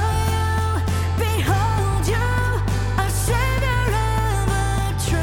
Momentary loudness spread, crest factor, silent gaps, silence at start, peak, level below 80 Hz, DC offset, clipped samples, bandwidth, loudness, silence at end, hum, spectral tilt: 2 LU; 12 dB; none; 0 s; -8 dBFS; -26 dBFS; under 0.1%; under 0.1%; 17.5 kHz; -21 LUFS; 0 s; none; -5 dB/octave